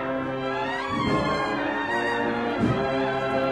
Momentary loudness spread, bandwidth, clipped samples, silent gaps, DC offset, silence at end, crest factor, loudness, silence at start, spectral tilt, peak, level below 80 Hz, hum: 4 LU; 12 kHz; under 0.1%; none; under 0.1%; 0 s; 14 dB; -25 LUFS; 0 s; -6 dB/octave; -12 dBFS; -48 dBFS; none